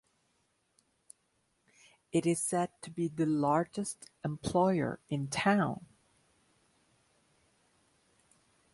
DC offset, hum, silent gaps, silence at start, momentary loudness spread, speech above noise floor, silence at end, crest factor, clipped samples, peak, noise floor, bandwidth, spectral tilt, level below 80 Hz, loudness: under 0.1%; none; none; 2.15 s; 10 LU; 45 dB; 2.9 s; 22 dB; under 0.1%; -14 dBFS; -76 dBFS; 11.5 kHz; -5.5 dB/octave; -66 dBFS; -32 LUFS